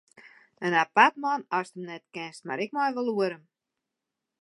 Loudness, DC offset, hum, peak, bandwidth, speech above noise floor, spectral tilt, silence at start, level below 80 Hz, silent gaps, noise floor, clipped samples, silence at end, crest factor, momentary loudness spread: -26 LUFS; under 0.1%; none; -4 dBFS; 11.5 kHz; 59 dB; -4.5 dB/octave; 0.6 s; -86 dBFS; none; -86 dBFS; under 0.1%; 1.05 s; 26 dB; 18 LU